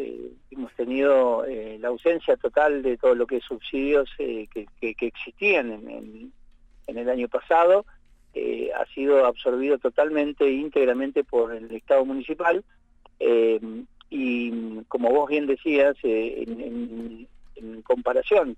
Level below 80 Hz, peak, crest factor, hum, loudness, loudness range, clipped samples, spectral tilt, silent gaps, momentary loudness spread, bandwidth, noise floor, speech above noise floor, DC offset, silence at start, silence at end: -54 dBFS; -8 dBFS; 16 dB; none; -24 LUFS; 3 LU; under 0.1%; -6 dB/octave; none; 17 LU; 8 kHz; -51 dBFS; 28 dB; under 0.1%; 0 s; 0 s